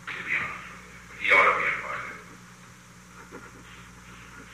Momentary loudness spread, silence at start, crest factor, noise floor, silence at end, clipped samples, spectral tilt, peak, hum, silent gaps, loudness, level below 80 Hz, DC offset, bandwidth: 27 LU; 0 s; 22 dB; -50 dBFS; 0 s; under 0.1%; -3 dB/octave; -8 dBFS; 60 Hz at -55 dBFS; none; -24 LUFS; -58 dBFS; under 0.1%; 15.5 kHz